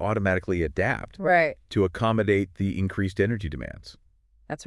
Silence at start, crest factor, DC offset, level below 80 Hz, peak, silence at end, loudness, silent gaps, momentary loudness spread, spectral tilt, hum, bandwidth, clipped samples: 0 s; 16 dB; under 0.1%; -46 dBFS; -10 dBFS; 0 s; -25 LUFS; none; 13 LU; -7 dB/octave; none; 12 kHz; under 0.1%